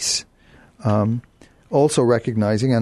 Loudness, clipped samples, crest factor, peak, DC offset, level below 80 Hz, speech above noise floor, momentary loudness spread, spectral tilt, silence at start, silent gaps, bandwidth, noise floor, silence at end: -20 LUFS; under 0.1%; 16 dB; -4 dBFS; under 0.1%; -54 dBFS; 33 dB; 8 LU; -5 dB/octave; 0 s; none; 12.5 kHz; -51 dBFS; 0 s